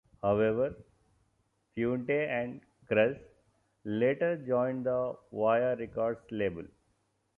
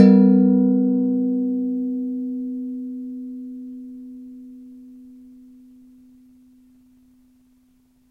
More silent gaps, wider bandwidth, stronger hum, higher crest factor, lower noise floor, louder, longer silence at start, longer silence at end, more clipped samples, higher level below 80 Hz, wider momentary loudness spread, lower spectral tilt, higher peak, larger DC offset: neither; second, 3.8 kHz vs 5.4 kHz; neither; about the same, 18 dB vs 22 dB; first, -75 dBFS vs -59 dBFS; second, -31 LUFS vs -20 LUFS; first, 0.25 s vs 0 s; second, 0.7 s vs 3.1 s; neither; about the same, -64 dBFS vs -68 dBFS; second, 11 LU vs 25 LU; second, -9 dB/octave vs -11 dB/octave; second, -14 dBFS vs 0 dBFS; neither